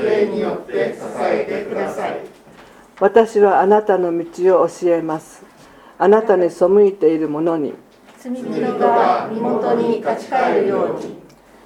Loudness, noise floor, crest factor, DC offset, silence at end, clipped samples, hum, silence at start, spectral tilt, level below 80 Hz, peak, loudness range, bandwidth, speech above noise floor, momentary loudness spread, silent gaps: -17 LUFS; -44 dBFS; 18 dB; under 0.1%; 0.45 s; under 0.1%; none; 0 s; -6.5 dB/octave; -60 dBFS; 0 dBFS; 3 LU; 11.5 kHz; 28 dB; 12 LU; none